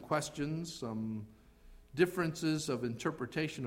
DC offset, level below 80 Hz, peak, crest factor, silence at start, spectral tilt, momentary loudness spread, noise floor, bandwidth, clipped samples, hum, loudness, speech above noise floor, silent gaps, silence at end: under 0.1%; -62 dBFS; -16 dBFS; 20 dB; 0 s; -5.5 dB/octave; 10 LU; -58 dBFS; 16 kHz; under 0.1%; none; -36 LUFS; 22 dB; none; 0 s